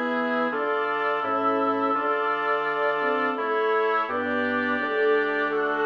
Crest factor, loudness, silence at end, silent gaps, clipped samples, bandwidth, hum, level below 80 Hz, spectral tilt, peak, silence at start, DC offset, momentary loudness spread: 12 dB; -24 LUFS; 0 s; none; under 0.1%; 6.2 kHz; none; -76 dBFS; -6 dB/octave; -12 dBFS; 0 s; under 0.1%; 2 LU